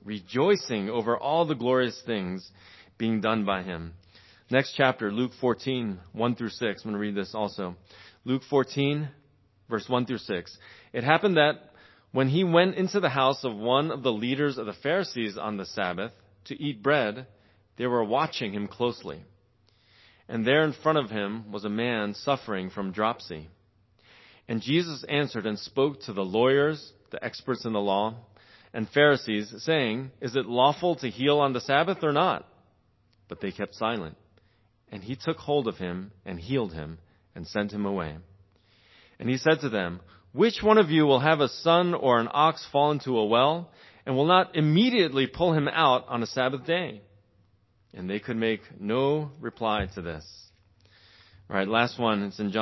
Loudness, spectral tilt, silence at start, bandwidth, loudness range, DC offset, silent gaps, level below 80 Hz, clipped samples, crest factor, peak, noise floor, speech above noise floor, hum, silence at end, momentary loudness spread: -26 LUFS; -6.5 dB/octave; 0.05 s; 6.2 kHz; 8 LU; under 0.1%; none; -58 dBFS; under 0.1%; 24 dB; -4 dBFS; -66 dBFS; 39 dB; none; 0 s; 15 LU